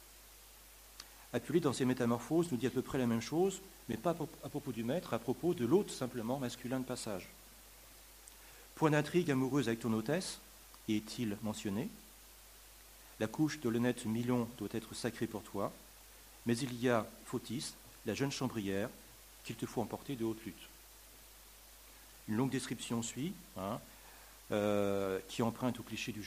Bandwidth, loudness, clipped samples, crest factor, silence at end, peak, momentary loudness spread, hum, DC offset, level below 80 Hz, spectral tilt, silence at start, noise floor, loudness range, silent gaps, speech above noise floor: 15.5 kHz; -37 LUFS; under 0.1%; 22 dB; 0 s; -16 dBFS; 22 LU; none; under 0.1%; -64 dBFS; -5.5 dB/octave; 0 s; -58 dBFS; 6 LU; none; 21 dB